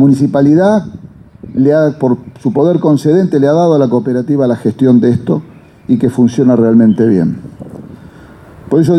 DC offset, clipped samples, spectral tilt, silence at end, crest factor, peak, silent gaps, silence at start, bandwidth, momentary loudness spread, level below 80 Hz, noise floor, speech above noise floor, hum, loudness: under 0.1%; under 0.1%; -9 dB/octave; 0 s; 10 dB; 0 dBFS; none; 0 s; 10.5 kHz; 12 LU; -48 dBFS; -36 dBFS; 26 dB; none; -11 LUFS